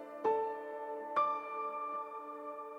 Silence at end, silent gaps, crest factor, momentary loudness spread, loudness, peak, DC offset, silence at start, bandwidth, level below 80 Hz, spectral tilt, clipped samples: 0 s; none; 16 dB; 11 LU; -38 LUFS; -22 dBFS; under 0.1%; 0 s; 8.4 kHz; -88 dBFS; -5 dB/octave; under 0.1%